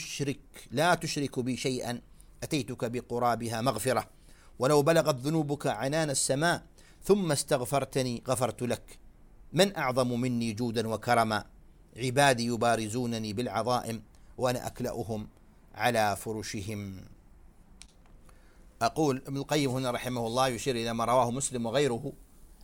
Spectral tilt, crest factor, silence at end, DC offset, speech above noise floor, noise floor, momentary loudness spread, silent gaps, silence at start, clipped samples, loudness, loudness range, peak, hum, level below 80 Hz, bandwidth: -4.5 dB/octave; 22 dB; 0 s; under 0.1%; 26 dB; -55 dBFS; 10 LU; none; 0 s; under 0.1%; -30 LUFS; 6 LU; -10 dBFS; none; -56 dBFS; 17.5 kHz